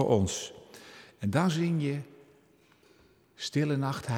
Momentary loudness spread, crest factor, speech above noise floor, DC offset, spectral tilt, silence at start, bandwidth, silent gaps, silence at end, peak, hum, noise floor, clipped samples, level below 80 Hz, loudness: 22 LU; 20 dB; 34 dB; under 0.1%; -6 dB/octave; 0 s; 16 kHz; none; 0 s; -10 dBFS; none; -63 dBFS; under 0.1%; -60 dBFS; -30 LUFS